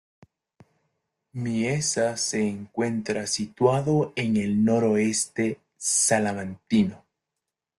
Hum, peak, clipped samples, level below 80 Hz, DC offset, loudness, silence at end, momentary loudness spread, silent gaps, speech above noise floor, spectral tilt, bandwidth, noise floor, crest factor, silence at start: none; -8 dBFS; under 0.1%; -62 dBFS; under 0.1%; -24 LUFS; 0.8 s; 8 LU; none; 61 dB; -4.5 dB/octave; 12.5 kHz; -85 dBFS; 18 dB; 1.35 s